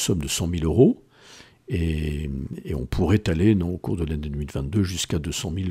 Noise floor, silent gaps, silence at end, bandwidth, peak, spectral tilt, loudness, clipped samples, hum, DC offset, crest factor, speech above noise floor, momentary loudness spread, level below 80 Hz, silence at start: -49 dBFS; none; 0 s; 16 kHz; -4 dBFS; -6 dB/octave; -24 LUFS; under 0.1%; none; under 0.1%; 20 dB; 26 dB; 12 LU; -38 dBFS; 0 s